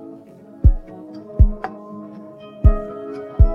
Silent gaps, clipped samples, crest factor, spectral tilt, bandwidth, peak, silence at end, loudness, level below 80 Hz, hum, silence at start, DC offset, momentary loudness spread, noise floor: none; under 0.1%; 18 dB; -11 dB/octave; 3.3 kHz; 0 dBFS; 0 s; -21 LUFS; -20 dBFS; none; 0.65 s; under 0.1%; 20 LU; -42 dBFS